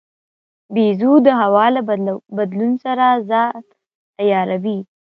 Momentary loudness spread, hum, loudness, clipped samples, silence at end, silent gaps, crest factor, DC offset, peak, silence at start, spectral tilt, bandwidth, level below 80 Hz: 11 LU; none; -16 LUFS; under 0.1%; 0.25 s; 3.95-4.13 s; 16 dB; under 0.1%; 0 dBFS; 0.7 s; -9 dB/octave; 5.4 kHz; -70 dBFS